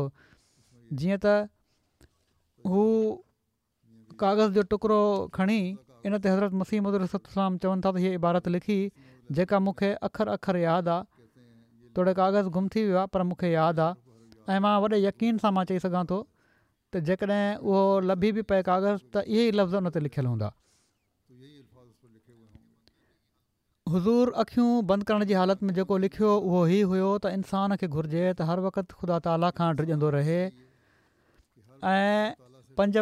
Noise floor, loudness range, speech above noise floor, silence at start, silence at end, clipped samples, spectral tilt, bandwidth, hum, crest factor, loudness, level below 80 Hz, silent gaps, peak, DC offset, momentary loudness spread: -78 dBFS; 4 LU; 52 dB; 0 s; 0 s; under 0.1%; -8 dB/octave; 11.5 kHz; none; 14 dB; -27 LUFS; -60 dBFS; none; -12 dBFS; under 0.1%; 8 LU